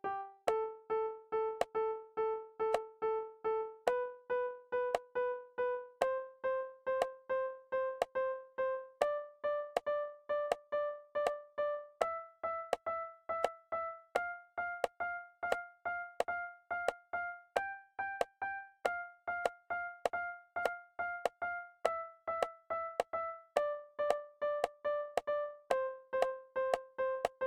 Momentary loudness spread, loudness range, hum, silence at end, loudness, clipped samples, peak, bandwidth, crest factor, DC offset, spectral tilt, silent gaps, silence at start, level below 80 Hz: 5 LU; 2 LU; none; 0 s; -38 LUFS; under 0.1%; -16 dBFS; 16.5 kHz; 22 dB; under 0.1%; -3 dB/octave; none; 0.05 s; -74 dBFS